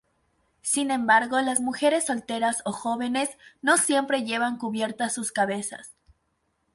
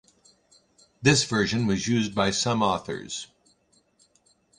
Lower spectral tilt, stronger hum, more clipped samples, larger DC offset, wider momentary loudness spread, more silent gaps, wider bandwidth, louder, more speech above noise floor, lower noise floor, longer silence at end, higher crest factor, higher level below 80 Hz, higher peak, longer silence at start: second, -2 dB/octave vs -4 dB/octave; neither; neither; neither; second, 9 LU vs 13 LU; neither; about the same, 12 kHz vs 11 kHz; about the same, -25 LUFS vs -24 LUFS; first, 48 dB vs 41 dB; first, -73 dBFS vs -65 dBFS; second, 0.85 s vs 1.35 s; about the same, 20 dB vs 24 dB; second, -68 dBFS vs -54 dBFS; about the same, -6 dBFS vs -4 dBFS; second, 0.65 s vs 1 s